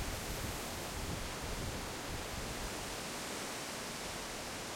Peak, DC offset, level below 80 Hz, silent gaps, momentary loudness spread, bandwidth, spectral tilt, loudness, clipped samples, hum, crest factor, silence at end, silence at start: -28 dBFS; under 0.1%; -50 dBFS; none; 1 LU; 16.5 kHz; -3 dB/octave; -41 LUFS; under 0.1%; none; 14 dB; 0 s; 0 s